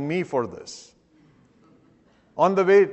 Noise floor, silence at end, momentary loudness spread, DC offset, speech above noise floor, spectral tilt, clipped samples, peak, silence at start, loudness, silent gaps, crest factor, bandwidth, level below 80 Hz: -59 dBFS; 0 s; 23 LU; under 0.1%; 38 dB; -6 dB/octave; under 0.1%; -6 dBFS; 0 s; -22 LUFS; none; 18 dB; 8.4 kHz; -68 dBFS